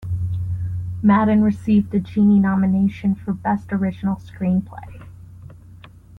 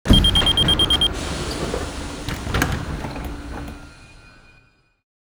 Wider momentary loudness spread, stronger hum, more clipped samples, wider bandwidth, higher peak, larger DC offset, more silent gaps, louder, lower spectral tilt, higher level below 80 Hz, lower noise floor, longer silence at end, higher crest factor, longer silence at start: second, 11 LU vs 18 LU; neither; neither; second, 4 kHz vs over 20 kHz; second, -6 dBFS vs 0 dBFS; neither; neither; about the same, -19 LUFS vs -19 LUFS; first, -10 dB/octave vs -4 dB/octave; second, -46 dBFS vs -28 dBFS; second, -43 dBFS vs -56 dBFS; second, 0 s vs 1.25 s; second, 14 dB vs 22 dB; about the same, 0 s vs 0.05 s